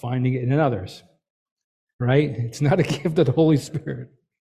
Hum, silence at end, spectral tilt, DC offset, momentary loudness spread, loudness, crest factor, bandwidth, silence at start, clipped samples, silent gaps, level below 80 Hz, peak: none; 0.5 s; -7.5 dB/octave; under 0.1%; 12 LU; -22 LUFS; 18 dB; 13 kHz; 0.05 s; under 0.1%; 1.30-1.57 s, 1.64-1.87 s, 1.93-1.99 s; -54 dBFS; -6 dBFS